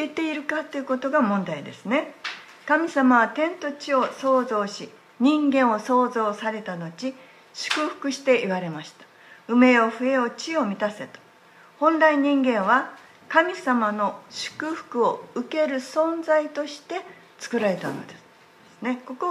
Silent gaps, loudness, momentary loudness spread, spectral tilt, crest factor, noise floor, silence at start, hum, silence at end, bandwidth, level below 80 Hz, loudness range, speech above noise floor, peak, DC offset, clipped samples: none; -23 LUFS; 15 LU; -5 dB/octave; 22 dB; -52 dBFS; 0 s; none; 0 s; 12 kHz; -78 dBFS; 4 LU; 29 dB; -2 dBFS; under 0.1%; under 0.1%